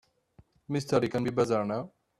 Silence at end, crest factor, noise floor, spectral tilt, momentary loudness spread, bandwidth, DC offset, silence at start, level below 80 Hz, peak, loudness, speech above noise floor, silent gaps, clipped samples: 0.3 s; 18 dB; -62 dBFS; -6.5 dB/octave; 7 LU; 13.5 kHz; under 0.1%; 0.7 s; -64 dBFS; -12 dBFS; -30 LUFS; 34 dB; none; under 0.1%